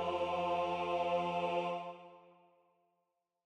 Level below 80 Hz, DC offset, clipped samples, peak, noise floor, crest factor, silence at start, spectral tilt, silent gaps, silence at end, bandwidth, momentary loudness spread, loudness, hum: -74 dBFS; under 0.1%; under 0.1%; -24 dBFS; -85 dBFS; 14 dB; 0 s; -6 dB/octave; none; 1.25 s; 9.6 kHz; 9 LU; -36 LUFS; none